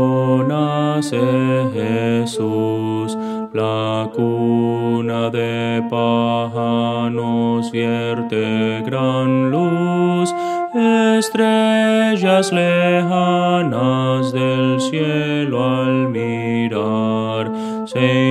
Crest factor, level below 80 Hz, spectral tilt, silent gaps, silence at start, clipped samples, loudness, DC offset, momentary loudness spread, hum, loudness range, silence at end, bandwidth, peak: 16 dB; -66 dBFS; -6.5 dB/octave; none; 0 s; under 0.1%; -17 LUFS; under 0.1%; 6 LU; none; 4 LU; 0 s; 13.5 kHz; 0 dBFS